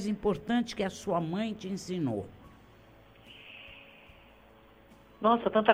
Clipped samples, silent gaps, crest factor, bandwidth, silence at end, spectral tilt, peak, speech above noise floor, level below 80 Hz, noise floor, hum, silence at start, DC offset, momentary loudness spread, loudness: under 0.1%; none; 26 dB; 16 kHz; 0 s; -6 dB/octave; -6 dBFS; 28 dB; -60 dBFS; -57 dBFS; none; 0 s; under 0.1%; 23 LU; -31 LUFS